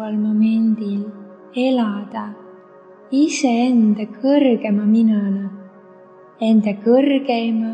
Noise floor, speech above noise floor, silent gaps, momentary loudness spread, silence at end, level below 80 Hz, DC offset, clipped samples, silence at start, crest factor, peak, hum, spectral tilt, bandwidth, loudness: -44 dBFS; 28 dB; none; 12 LU; 0 s; -74 dBFS; under 0.1%; under 0.1%; 0 s; 14 dB; -4 dBFS; none; -6.5 dB/octave; 8.8 kHz; -17 LUFS